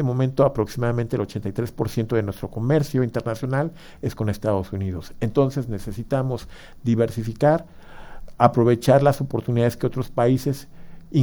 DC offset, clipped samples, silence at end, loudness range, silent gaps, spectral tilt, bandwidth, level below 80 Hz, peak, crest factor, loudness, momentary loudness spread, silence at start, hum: under 0.1%; under 0.1%; 0 s; 5 LU; none; -8 dB/octave; over 20 kHz; -44 dBFS; 0 dBFS; 22 dB; -23 LUFS; 11 LU; 0 s; none